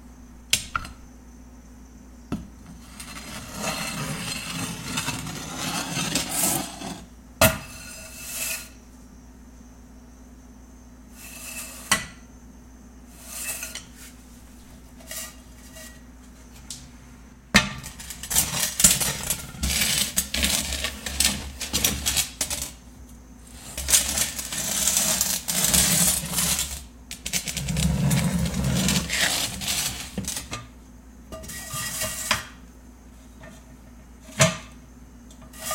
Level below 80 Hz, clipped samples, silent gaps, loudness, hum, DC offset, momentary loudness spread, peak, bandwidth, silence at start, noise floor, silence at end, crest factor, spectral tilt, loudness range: -42 dBFS; under 0.1%; none; -24 LUFS; none; under 0.1%; 22 LU; 0 dBFS; 17 kHz; 0 s; -47 dBFS; 0 s; 28 dB; -2 dB/octave; 15 LU